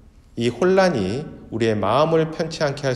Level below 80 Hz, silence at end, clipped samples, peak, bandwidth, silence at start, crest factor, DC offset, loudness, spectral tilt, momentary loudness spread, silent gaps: -50 dBFS; 0 s; under 0.1%; -4 dBFS; 12 kHz; 0.35 s; 18 dB; under 0.1%; -20 LUFS; -6 dB/octave; 11 LU; none